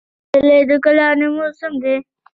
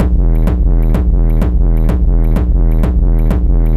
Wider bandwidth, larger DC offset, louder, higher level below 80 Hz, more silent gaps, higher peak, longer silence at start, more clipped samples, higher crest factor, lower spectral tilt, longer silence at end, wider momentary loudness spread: first, 5.4 kHz vs 3.1 kHz; neither; about the same, -15 LUFS vs -14 LUFS; second, -56 dBFS vs -10 dBFS; neither; about the same, -2 dBFS vs 0 dBFS; first, 0.35 s vs 0 s; neither; about the same, 14 dB vs 10 dB; second, -6.5 dB/octave vs -9.5 dB/octave; first, 0.3 s vs 0 s; first, 10 LU vs 0 LU